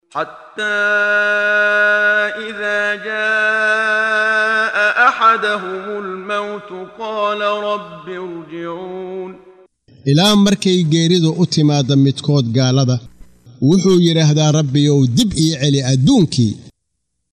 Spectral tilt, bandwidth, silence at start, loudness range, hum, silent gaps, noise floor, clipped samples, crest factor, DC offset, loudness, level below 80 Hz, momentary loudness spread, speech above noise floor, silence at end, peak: -5 dB/octave; 14 kHz; 0.15 s; 9 LU; none; none; -73 dBFS; under 0.1%; 16 dB; under 0.1%; -14 LUFS; -48 dBFS; 15 LU; 58 dB; 0.65 s; 0 dBFS